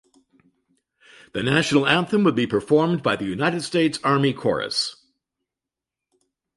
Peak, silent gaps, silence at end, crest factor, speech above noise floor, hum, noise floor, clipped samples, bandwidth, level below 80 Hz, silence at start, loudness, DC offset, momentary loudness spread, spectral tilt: -4 dBFS; none; 1.65 s; 20 dB; 67 dB; none; -87 dBFS; under 0.1%; 11.5 kHz; -58 dBFS; 1.35 s; -21 LUFS; under 0.1%; 6 LU; -5 dB/octave